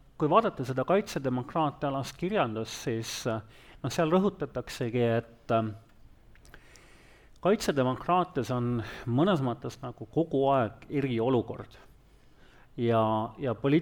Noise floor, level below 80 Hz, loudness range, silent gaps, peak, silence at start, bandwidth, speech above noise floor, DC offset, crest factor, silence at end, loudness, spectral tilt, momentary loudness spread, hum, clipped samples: -57 dBFS; -56 dBFS; 2 LU; none; -8 dBFS; 0.2 s; 19 kHz; 29 dB; under 0.1%; 20 dB; 0 s; -29 LUFS; -6.5 dB/octave; 11 LU; none; under 0.1%